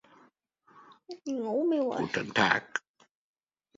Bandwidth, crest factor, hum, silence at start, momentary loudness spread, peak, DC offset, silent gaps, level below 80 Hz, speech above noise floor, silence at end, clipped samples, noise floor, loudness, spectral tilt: 7.8 kHz; 26 dB; none; 0.75 s; 13 LU; -8 dBFS; under 0.1%; none; -70 dBFS; 39 dB; 1 s; under 0.1%; -68 dBFS; -29 LUFS; -4.5 dB/octave